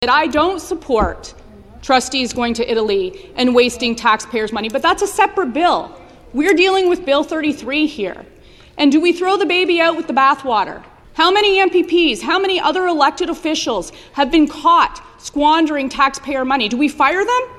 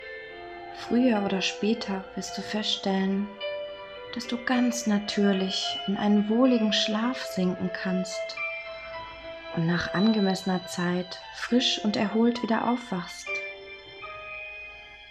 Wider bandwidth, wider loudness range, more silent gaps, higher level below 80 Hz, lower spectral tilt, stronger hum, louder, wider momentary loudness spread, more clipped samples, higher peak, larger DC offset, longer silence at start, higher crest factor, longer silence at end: about the same, 13.5 kHz vs 13.5 kHz; about the same, 3 LU vs 4 LU; neither; first, -42 dBFS vs -60 dBFS; second, -3 dB/octave vs -5 dB/octave; neither; first, -16 LUFS vs -27 LUFS; second, 11 LU vs 16 LU; neither; first, 0 dBFS vs -10 dBFS; neither; about the same, 0 s vs 0 s; about the same, 16 dB vs 18 dB; about the same, 0 s vs 0 s